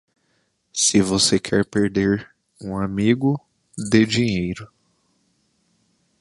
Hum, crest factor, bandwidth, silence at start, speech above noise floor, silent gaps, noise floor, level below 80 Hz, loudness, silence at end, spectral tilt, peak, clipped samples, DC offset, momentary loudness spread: none; 20 dB; 11.5 kHz; 0.75 s; 48 dB; none; -68 dBFS; -48 dBFS; -20 LUFS; 1.55 s; -4 dB/octave; -2 dBFS; under 0.1%; under 0.1%; 14 LU